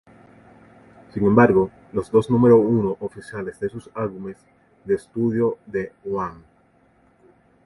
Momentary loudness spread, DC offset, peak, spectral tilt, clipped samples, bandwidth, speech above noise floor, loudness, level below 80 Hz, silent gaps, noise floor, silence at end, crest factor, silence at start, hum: 17 LU; under 0.1%; 0 dBFS; -9 dB/octave; under 0.1%; 11.5 kHz; 38 dB; -21 LUFS; -52 dBFS; none; -59 dBFS; 1.3 s; 22 dB; 1.15 s; none